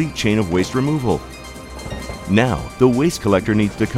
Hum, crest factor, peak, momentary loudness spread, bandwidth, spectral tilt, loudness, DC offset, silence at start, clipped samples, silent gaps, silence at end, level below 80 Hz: none; 18 dB; 0 dBFS; 15 LU; 16 kHz; -6 dB/octave; -18 LUFS; under 0.1%; 0 s; under 0.1%; none; 0 s; -38 dBFS